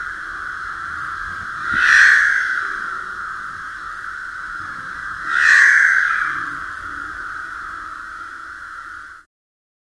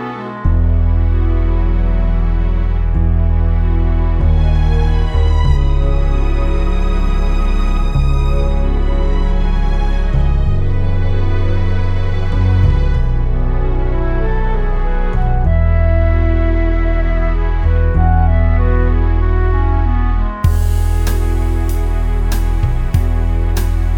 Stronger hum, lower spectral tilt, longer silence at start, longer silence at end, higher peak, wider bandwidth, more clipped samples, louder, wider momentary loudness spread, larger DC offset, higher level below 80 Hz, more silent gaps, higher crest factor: neither; second, -0.5 dB/octave vs -7.5 dB/octave; about the same, 0 s vs 0 s; first, 0.8 s vs 0 s; about the same, 0 dBFS vs 0 dBFS; first, 12 kHz vs 9.4 kHz; neither; about the same, -16 LUFS vs -16 LUFS; first, 21 LU vs 4 LU; neither; second, -50 dBFS vs -12 dBFS; neither; first, 20 dB vs 12 dB